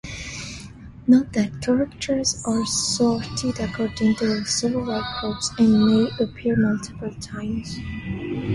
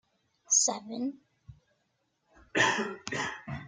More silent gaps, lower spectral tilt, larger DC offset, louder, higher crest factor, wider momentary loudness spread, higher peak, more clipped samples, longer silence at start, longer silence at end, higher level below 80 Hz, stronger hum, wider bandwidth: neither; first, -4.5 dB/octave vs -1.5 dB/octave; neither; first, -22 LUFS vs -29 LUFS; about the same, 18 dB vs 22 dB; about the same, 14 LU vs 12 LU; first, -6 dBFS vs -12 dBFS; neither; second, 0.05 s vs 0.5 s; about the same, 0 s vs 0 s; first, -44 dBFS vs -66 dBFS; neither; about the same, 11.5 kHz vs 10.5 kHz